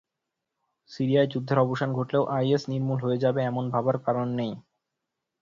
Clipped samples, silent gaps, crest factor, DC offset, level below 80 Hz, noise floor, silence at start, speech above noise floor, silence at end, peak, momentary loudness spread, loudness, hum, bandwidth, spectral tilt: under 0.1%; none; 18 dB; under 0.1%; -66 dBFS; -85 dBFS; 0.9 s; 59 dB; 0.8 s; -8 dBFS; 6 LU; -26 LUFS; none; 7.4 kHz; -8 dB/octave